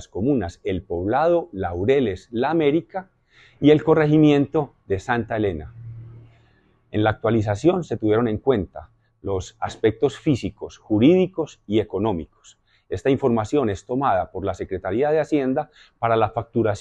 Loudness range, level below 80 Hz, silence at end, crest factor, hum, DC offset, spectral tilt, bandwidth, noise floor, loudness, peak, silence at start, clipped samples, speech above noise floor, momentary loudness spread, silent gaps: 4 LU; -48 dBFS; 0 s; 18 dB; none; under 0.1%; -7.5 dB/octave; 9 kHz; -59 dBFS; -22 LUFS; -4 dBFS; 0 s; under 0.1%; 38 dB; 14 LU; none